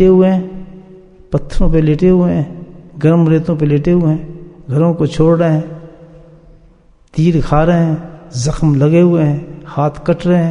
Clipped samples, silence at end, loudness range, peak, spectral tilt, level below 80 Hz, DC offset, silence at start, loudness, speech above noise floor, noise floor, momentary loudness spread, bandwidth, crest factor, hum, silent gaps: under 0.1%; 0 s; 3 LU; 0 dBFS; -8.5 dB/octave; -26 dBFS; under 0.1%; 0 s; -13 LUFS; 34 dB; -46 dBFS; 15 LU; 10 kHz; 12 dB; none; none